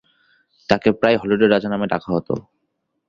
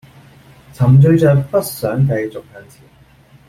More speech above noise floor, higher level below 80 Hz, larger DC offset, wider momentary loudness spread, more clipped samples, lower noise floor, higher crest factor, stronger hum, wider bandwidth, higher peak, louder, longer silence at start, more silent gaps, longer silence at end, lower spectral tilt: first, 55 dB vs 33 dB; second, -52 dBFS vs -46 dBFS; neither; about the same, 12 LU vs 13 LU; neither; first, -73 dBFS vs -46 dBFS; about the same, 18 dB vs 14 dB; neither; second, 7.4 kHz vs 16 kHz; about the same, -2 dBFS vs -2 dBFS; second, -19 LUFS vs -13 LUFS; about the same, 0.7 s vs 0.8 s; neither; second, 0.7 s vs 0.9 s; about the same, -7 dB/octave vs -8 dB/octave